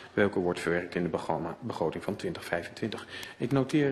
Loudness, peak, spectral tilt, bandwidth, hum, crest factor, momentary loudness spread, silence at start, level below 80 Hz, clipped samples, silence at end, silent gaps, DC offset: -32 LUFS; -12 dBFS; -6.5 dB/octave; 13 kHz; none; 20 dB; 9 LU; 0 s; -60 dBFS; under 0.1%; 0 s; none; under 0.1%